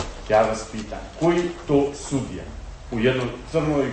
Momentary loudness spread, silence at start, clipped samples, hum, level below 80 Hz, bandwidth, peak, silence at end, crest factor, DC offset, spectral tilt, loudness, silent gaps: 14 LU; 0 s; under 0.1%; none; -40 dBFS; 8.8 kHz; -8 dBFS; 0 s; 16 dB; under 0.1%; -6 dB/octave; -23 LUFS; none